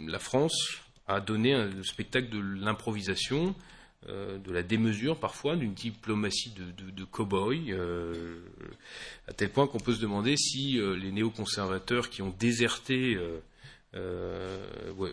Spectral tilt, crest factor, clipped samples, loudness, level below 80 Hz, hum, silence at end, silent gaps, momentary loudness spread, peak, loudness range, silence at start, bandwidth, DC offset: -4.5 dB/octave; 20 dB; under 0.1%; -31 LUFS; -56 dBFS; none; 0 s; none; 16 LU; -12 dBFS; 4 LU; 0 s; 11 kHz; under 0.1%